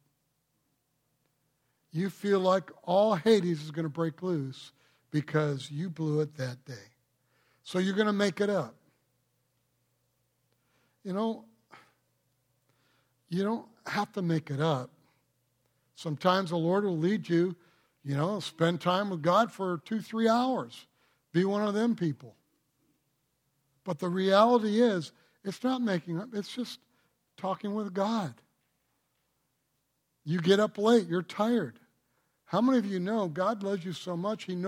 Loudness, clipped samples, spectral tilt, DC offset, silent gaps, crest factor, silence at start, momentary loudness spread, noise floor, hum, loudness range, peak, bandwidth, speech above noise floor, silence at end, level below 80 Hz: -30 LUFS; under 0.1%; -6.5 dB/octave; under 0.1%; none; 22 dB; 1.95 s; 15 LU; -78 dBFS; none; 8 LU; -10 dBFS; 16 kHz; 49 dB; 0 s; -78 dBFS